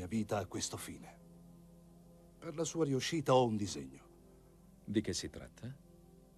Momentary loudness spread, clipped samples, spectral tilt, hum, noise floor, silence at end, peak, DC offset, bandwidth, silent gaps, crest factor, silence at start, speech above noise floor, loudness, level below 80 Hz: 26 LU; under 0.1%; -5 dB/octave; none; -61 dBFS; 0.6 s; -18 dBFS; under 0.1%; 13.5 kHz; none; 22 dB; 0 s; 25 dB; -37 LUFS; -64 dBFS